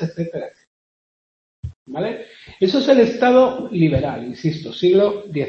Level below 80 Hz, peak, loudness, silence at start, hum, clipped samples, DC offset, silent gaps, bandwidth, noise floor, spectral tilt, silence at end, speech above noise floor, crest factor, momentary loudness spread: -48 dBFS; 0 dBFS; -18 LUFS; 0 s; none; under 0.1%; under 0.1%; 0.67-1.63 s, 1.76-1.86 s; 7.2 kHz; under -90 dBFS; -7.5 dB/octave; 0 s; over 72 dB; 18 dB; 19 LU